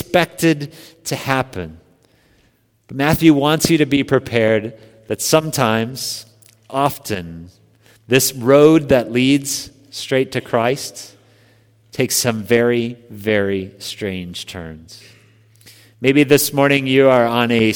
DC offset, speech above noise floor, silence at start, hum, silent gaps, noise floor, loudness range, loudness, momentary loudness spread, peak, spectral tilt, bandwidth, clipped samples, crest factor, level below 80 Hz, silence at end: under 0.1%; 42 dB; 0 s; none; none; -58 dBFS; 5 LU; -16 LUFS; 17 LU; 0 dBFS; -4.5 dB/octave; over 20 kHz; under 0.1%; 18 dB; -50 dBFS; 0 s